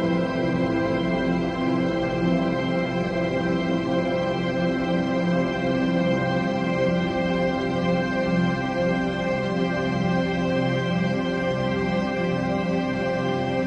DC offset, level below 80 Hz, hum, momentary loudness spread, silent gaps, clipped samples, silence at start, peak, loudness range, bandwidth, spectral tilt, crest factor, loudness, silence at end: under 0.1%; -46 dBFS; none; 2 LU; none; under 0.1%; 0 s; -10 dBFS; 1 LU; 8.4 kHz; -7 dB/octave; 12 dB; -24 LUFS; 0 s